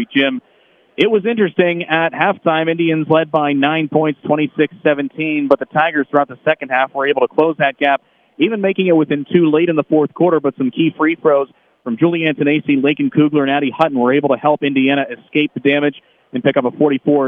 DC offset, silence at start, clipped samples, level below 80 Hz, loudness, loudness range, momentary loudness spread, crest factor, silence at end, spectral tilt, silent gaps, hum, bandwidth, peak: under 0.1%; 0 s; under 0.1%; -68 dBFS; -15 LUFS; 1 LU; 5 LU; 16 dB; 0 s; -8.5 dB/octave; none; none; 4.2 kHz; 0 dBFS